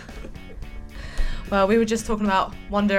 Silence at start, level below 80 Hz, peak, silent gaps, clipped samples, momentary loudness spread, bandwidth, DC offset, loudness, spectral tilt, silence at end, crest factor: 0 s; -32 dBFS; -8 dBFS; none; under 0.1%; 21 LU; 14.5 kHz; under 0.1%; -23 LUFS; -5.5 dB/octave; 0 s; 16 dB